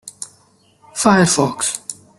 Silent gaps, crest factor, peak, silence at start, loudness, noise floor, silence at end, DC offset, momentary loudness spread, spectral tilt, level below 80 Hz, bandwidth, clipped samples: none; 18 dB; -2 dBFS; 0.05 s; -16 LUFS; -54 dBFS; 0.25 s; under 0.1%; 20 LU; -4 dB/octave; -54 dBFS; 12.5 kHz; under 0.1%